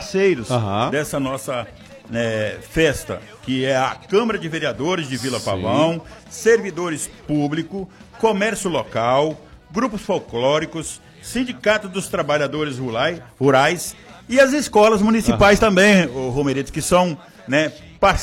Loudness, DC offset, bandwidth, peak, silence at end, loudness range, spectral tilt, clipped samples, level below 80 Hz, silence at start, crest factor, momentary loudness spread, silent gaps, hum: -19 LUFS; under 0.1%; 16.5 kHz; -2 dBFS; 0 s; 6 LU; -4.5 dB/octave; under 0.1%; -40 dBFS; 0 s; 16 dB; 13 LU; none; none